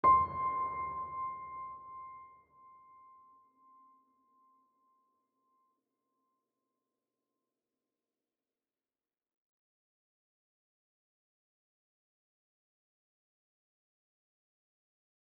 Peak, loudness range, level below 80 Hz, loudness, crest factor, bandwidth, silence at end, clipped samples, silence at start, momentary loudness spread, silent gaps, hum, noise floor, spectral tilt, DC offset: -16 dBFS; 26 LU; -68 dBFS; -35 LUFS; 26 dB; 4.3 kHz; 13 s; under 0.1%; 0.05 s; 22 LU; none; none; under -90 dBFS; -5.5 dB/octave; under 0.1%